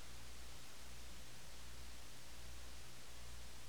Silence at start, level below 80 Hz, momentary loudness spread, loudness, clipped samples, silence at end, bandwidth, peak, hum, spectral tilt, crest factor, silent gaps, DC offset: 0 s; -60 dBFS; 1 LU; -56 LUFS; under 0.1%; 0 s; over 20 kHz; -40 dBFS; 60 Hz at -65 dBFS; -2.5 dB/octave; 12 dB; none; 0.4%